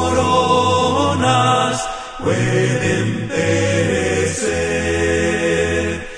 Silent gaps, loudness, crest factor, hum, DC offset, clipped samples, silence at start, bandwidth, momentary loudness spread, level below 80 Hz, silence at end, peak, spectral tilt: none; -17 LUFS; 14 dB; none; under 0.1%; under 0.1%; 0 s; 10 kHz; 6 LU; -38 dBFS; 0 s; -2 dBFS; -4.5 dB/octave